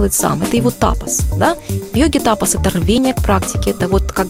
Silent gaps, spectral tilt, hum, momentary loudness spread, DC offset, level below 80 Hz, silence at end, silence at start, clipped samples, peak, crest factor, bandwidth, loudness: none; -4.5 dB/octave; none; 3 LU; under 0.1%; -24 dBFS; 0 s; 0 s; under 0.1%; 0 dBFS; 14 dB; 16.5 kHz; -15 LUFS